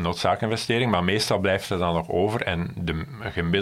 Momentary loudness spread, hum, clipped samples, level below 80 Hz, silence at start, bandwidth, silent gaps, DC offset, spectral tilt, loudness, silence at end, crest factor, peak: 7 LU; none; under 0.1%; -44 dBFS; 0 s; 15.5 kHz; none; under 0.1%; -5.5 dB/octave; -24 LUFS; 0 s; 20 dB; -6 dBFS